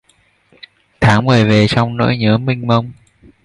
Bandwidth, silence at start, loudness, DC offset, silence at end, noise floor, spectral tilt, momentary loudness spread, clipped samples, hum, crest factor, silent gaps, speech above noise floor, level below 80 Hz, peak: 11 kHz; 1 s; -13 LUFS; under 0.1%; 0.5 s; -56 dBFS; -7 dB/octave; 6 LU; under 0.1%; none; 14 dB; none; 43 dB; -40 dBFS; 0 dBFS